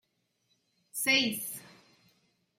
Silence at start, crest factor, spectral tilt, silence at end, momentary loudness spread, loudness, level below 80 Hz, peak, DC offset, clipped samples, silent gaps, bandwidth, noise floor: 0.95 s; 22 dB; -1 dB/octave; 0.9 s; 16 LU; -28 LUFS; -80 dBFS; -14 dBFS; under 0.1%; under 0.1%; none; 16 kHz; -77 dBFS